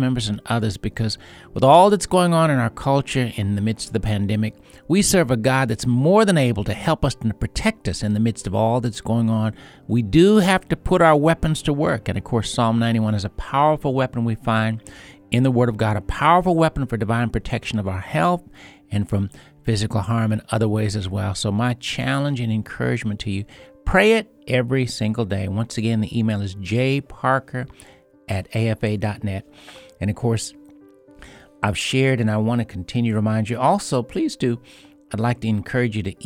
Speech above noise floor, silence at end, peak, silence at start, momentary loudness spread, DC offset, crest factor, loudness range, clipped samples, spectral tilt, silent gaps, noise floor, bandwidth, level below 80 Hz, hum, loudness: 28 dB; 0 s; 0 dBFS; 0 s; 10 LU; under 0.1%; 20 dB; 6 LU; under 0.1%; -6 dB/octave; none; -48 dBFS; 15.5 kHz; -40 dBFS; none; -20 LUFS